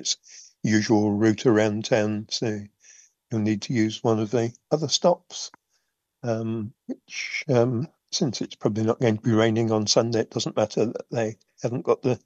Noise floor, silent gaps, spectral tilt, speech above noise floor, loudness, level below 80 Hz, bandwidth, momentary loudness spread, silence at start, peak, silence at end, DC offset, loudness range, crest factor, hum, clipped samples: -74 dBFS; none; -5 dB/octave; 50 dB; -24 LUFS; -68 dBFS; 8.4 kHz; 11 LU; 0 s; -6 dBFS; 0.1 s; under 0.1%; 4 LU; 18 dB; none; under 0.1%